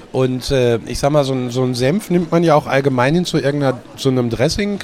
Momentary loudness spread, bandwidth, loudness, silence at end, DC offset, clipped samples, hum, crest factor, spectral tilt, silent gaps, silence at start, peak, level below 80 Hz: 5 LU; 16 kHz; -16 LUFS; 0 s; under 0.1%; under 0.1%; none; 16 dB; -6 dB/octave; none; 0 s; 0 dBFS; -38 dBFS